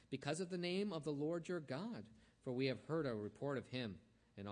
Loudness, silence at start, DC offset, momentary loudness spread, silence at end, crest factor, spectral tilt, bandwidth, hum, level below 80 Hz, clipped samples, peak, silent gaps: -44 LUFS; 0.1 s; under 0.1%; 12 LU; 0 s; 18 dB; -6 dB/octave; 10 kHz; none; -78 dBFS; under 0.1%; -26 dBFS; none